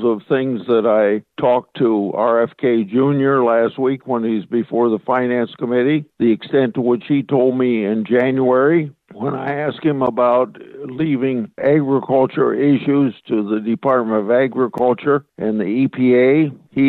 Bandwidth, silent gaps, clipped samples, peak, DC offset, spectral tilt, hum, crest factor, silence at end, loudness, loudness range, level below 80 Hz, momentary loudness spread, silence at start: 4.3 kHz; none; under 0.1%; -4 dBFS; under 0.1%; -10 dB/octave; none; 14 dB; 0 s; -17 LUFS; 2 LU; -64 dBFS; 6 LU; 0 s